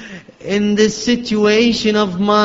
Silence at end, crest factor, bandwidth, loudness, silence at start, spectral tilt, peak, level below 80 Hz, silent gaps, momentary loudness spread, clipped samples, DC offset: 0 s; 14 dB; 7.8 kHz; -15 LUFS; 0 s; -4.5 dB/octave; 0 dBFS; -46 dBFS; none; 9 LU; under 0.1%; under 0.1%